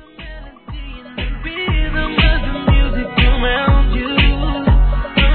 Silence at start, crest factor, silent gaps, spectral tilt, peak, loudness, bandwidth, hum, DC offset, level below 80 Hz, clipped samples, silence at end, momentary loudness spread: 0.2 s; 14 dB; none; -9.5 dB/octave; -2 dBFS; -16 LUFS; 4.5 kHz; none; under 0.1%; -16 dBFS; under 0.1%; 0 s; 17 LU